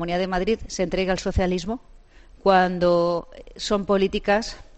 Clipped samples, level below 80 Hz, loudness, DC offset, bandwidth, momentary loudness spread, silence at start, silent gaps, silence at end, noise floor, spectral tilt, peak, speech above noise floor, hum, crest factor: under 0.1%; -38 dBFS; -23 LUFS; under 0.1%; 8.6 kHz; 11 LU; 0 s; none; 0.15 s; -48 dBFS; -5.5 dB/octave; -6 dBFS; 26 dB; none; 18 dB